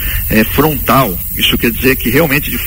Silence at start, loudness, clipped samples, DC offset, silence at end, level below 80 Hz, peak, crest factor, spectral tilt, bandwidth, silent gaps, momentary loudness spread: 0 s; -11 LUFS; under 0.1%; under 0.1%; 0 s; -24 dBFS; 0 dBFS; 12 dB; -4.5 dB/octave; 17 kHz; none; 2 LU